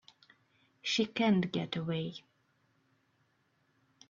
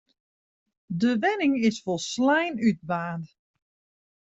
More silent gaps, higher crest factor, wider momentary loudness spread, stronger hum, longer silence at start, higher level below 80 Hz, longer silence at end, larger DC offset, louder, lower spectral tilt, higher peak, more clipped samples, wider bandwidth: neither; about the same, 18 dB vs 16 dB; about the same, 13 LU vs 12 LU; neither; about the same, 0.85 s vs 0.9 s; second, -76 dBFS vs -68 dBFS; first, 1.9 s vs 0.95 s; neither; second, -33 LUFS vs -25 LUFS; about the same, -4.5 dB/octave vs -5 dB/octave; second, -18 dBFS vs -10 dBFS; neither; about the same, 7.4 kHz vs 8 kHz